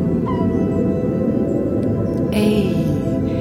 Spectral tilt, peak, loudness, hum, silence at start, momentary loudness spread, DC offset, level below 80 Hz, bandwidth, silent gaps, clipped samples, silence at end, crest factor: -8.5 dB/octave; -4 dBFS; -19 LUFS; none; 0 s; 3 LU; under 0.1%; -36 dBFS; 16.5 kHz; none; under 0.1%; 0 s; 14 dB